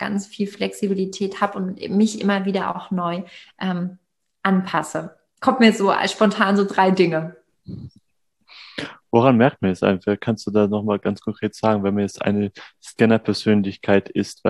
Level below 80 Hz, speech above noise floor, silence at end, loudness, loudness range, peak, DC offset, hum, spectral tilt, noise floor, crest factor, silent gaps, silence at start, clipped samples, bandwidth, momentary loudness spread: -62 dBFS; 44 dB; 0 s; -20 LUFS; 4 LU; -2 dBFS; under 0.1%; none; -6 dB/octave; -64 dBFS; 20 dB; none; 0 s; under 0.1%; 12 kHz; 15 LU